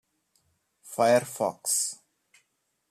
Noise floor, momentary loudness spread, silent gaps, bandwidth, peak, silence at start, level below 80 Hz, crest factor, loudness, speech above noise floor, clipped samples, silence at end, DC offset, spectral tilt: -76 dBFS; 14 LU; none; 15 kHz; -10 dBFS; 0.85 s; -76 dBFS; 20 dB; -26 LUFS; 50 dB; under 0.1%; 0.95 s; under 0.1%; -2.5 dB/octave